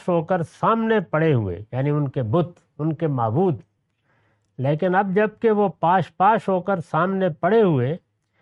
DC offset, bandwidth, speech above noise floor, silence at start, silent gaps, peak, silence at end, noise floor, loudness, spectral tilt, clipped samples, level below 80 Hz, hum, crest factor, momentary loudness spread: under 0.1%; 10 kHz; 47 dB; 0.05 s; none; -6 dBFS; 0.45 s; -67 dBFS; -21 LUFS; -9 dB/octave; under 0.1%; -62 dBFS; none; 14 dB; 8 LU